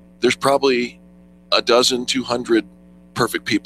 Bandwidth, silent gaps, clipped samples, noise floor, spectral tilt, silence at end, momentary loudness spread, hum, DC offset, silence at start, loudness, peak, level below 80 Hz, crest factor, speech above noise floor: 15 kHz; none; under 0.1%; -47 dBFS; -3 dB/octave; 0.05 s; 7 LU; none; under 0.1%; 0.2 s; -18 LUFS; 0 dBFS; -54 dBFS; 20 dB; 29 dB